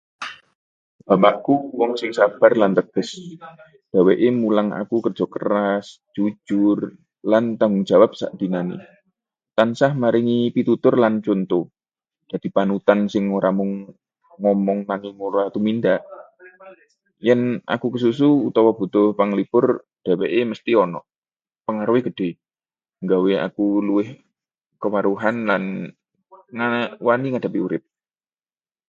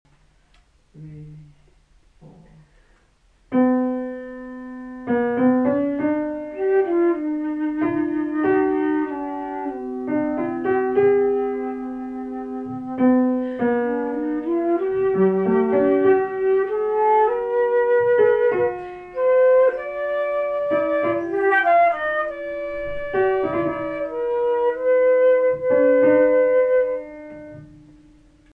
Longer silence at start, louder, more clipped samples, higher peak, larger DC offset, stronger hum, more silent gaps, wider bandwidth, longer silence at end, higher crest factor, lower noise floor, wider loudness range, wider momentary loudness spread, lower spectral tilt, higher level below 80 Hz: second, 0.2 s vs 0.95 s; about the same, -20 LUFS vs -20 LUFS; neither; first, 0 dBFS vs -6 dBFS; neither; neither; first, 0.55-0.99 s, 21.18-21.22 s vs none; first, 7.8 kHz vs 3.7 kHz; first, 1.1 s vs 0.8 s; about the same, 20 dB vs 16 dB; first, under -90 dBFS vs -58 dBFS; about the same, 4 LU vs 5 LU; about the same, 13 LU vs 14 LU; second, -7.5 dB/octave vs -9 dB/octave; second, -66 dBFS vs -54 dBFS